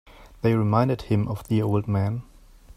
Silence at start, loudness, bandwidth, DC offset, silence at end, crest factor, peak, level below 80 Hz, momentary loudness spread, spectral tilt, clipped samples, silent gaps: 0.2 s; -24 LUFS; 13.5 kHz; under 0.1%; 0.05 s; 18 dB; -6 dBFS; -48 dBFS; 6 LU; -9 dB/octave; under 0.1%; none